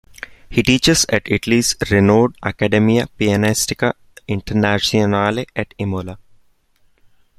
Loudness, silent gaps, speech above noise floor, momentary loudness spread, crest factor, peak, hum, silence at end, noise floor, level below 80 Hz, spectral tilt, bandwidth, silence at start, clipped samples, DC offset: -17 LUFS; none; 40 dB; 12 LU; 16 dB; -2 dBFS; none; 1.2 s; -56 dBFS; -42 dBFS; -4.5 dB/octave; 15 kHz; 0.5 s; under 0.1%; under 0.1%